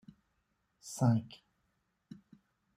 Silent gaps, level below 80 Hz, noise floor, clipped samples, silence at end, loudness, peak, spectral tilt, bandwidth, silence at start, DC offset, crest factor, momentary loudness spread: none; -74 dBFS; -80 dBFS; under 0.1%; 1.5 s; -33 LUFS; -18 dBFS; -7 dB/octave; 15.5 kHz; 0.85 s; under 0.1%; 20 dB; 25 LU